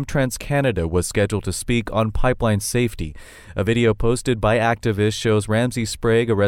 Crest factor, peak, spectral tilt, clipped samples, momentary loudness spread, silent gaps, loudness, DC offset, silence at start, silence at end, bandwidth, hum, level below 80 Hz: 14 dB; -6 dBFS; -5.5 dB/octave; under 0.1%; 5 LU; none; -20 LUFS; under 0.1%; 0 s; 0 s; 16.5 kHz; none; -34 dBFS